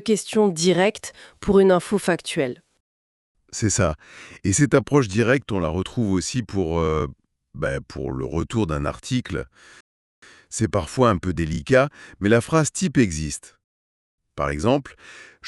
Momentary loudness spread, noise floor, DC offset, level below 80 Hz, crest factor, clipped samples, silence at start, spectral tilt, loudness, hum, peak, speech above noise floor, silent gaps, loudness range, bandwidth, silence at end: 13 LU; under -90 dBFS; under 0.1%; -44 dBFS; 22 dB; under 0.1%; 0 s; -5 dB/octave; -22 LUFS; none; -2 dBFS; over 68 dB; 2.80-3.35 s, 9.80-10.22 s, 13.64-14.18 s; 5 LU; 12 kHz; 0 s